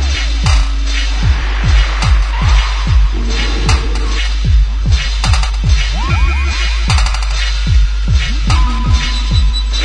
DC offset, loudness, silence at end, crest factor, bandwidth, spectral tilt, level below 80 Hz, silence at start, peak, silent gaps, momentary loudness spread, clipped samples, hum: under 0.1%; -14 LUFS; 0 s; 12 dB; 10 kHz; -4 dB/octave; -12 dBFS; 0 s; 0 dBFS; none; 3 LU; under 0.1%; none